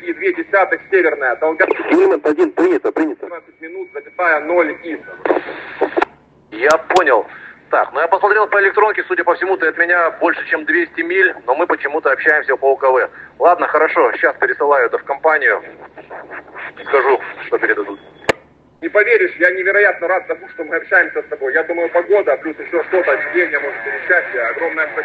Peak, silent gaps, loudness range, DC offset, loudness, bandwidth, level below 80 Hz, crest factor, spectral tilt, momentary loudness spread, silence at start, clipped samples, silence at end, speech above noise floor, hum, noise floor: 0 dBFS; none; 4 LU; under 0.1%; -15 LUFS; 8.8 kHz; -60 dBFS; 16 dB; -4.5 dB/octave; 14 LU; 0 s; under 0.1%; 0 s; 27 dB; none; -43 dBFS